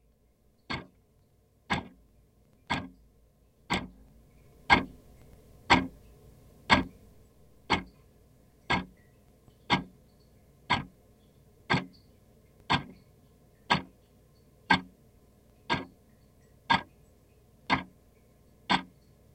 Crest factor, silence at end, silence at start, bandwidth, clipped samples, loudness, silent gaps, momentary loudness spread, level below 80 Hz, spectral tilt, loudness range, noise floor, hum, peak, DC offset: 30 dB; 0.5 s; 0.7 s; 16 kHz; under 0.1%; -30 LUFS; none; 25 LU; -54 dBFS; -4.5 dB/octave; 9 LU; -66 dBFS; none; -6 dBFS; under 0.1%